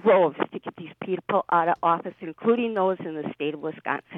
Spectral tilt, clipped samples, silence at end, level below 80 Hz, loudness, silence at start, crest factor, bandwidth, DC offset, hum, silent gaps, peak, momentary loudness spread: -9 dB/octave; under 0.1%; 0 s; -72 dBFS; -25 LUFS; 0.05 s; 16 dB; 4 kHz; under 0.1%; none; none; -8 dBFS; 13 LU